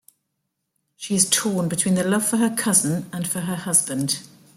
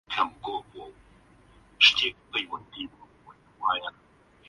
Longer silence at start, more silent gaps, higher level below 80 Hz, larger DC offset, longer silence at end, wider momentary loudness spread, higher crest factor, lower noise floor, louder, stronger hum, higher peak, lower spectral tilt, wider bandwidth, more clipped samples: first, 1 s vs 0.1 s; neither; about the same, -64 dBFS vs -62 dBFS; neither; second, 0.3 s vs 0.6 s; second, 8 LU vs 22 LU; second, 20 dB vs 26 dB; first, -77 dBFS vs -57 dBFS; first, -20 LUFS vs -25 LUFS; neither; about the same, -2 dBFS vs -4 dBFS; first, -3.5 dB/octave vs -1 dB/octave; first, 16.5 kHz vs 11.5 kHz; neither